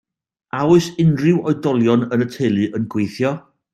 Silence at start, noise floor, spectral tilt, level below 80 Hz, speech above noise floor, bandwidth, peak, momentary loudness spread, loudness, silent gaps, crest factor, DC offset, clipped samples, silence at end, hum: 0.55 s; -70 dBFS; -7.5 dB/octave; -58 dBFS; 54 dB; 13 kHz; -2 dBFS; 7 LU; -18 LUFS; none; 16 dB; under 0.1%; under 0.1%; 0.35 s; none